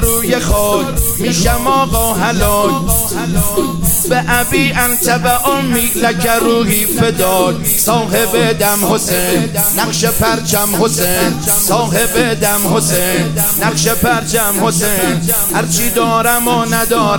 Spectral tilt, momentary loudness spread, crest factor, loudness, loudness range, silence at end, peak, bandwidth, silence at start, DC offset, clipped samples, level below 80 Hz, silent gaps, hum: -3.5 dB/octave; 2 LU; 12 dB; -12 LUFS; 1 LU; 0 s; 0 dBFS; 17.5 kHz; 0 s; under 0.1%; under 0.1%; -26 dBFS; none; none